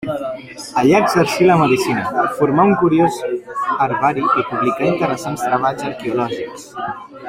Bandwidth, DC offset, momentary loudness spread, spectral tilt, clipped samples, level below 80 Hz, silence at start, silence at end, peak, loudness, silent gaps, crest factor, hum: 16 kHz; under 0.1%; 14 LU; -6 dB/octave; under 0.1%; -54 dBFS; 0 s; 0 s; -2 dBFS; -17 LUFS; none; 16 dB; none